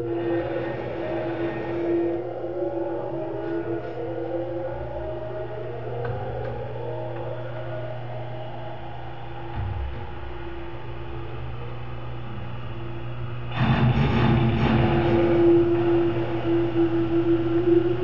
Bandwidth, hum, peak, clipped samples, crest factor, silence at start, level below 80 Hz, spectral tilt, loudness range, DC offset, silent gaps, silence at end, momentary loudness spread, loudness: 5.8 kHz; none; -8 dBFS; under 0.1%; 18 dB; 0 s; -40 dBFS; -7 dB/octave; 14 LU; 2%; none; 0 s; 15 LU; -26 LUFS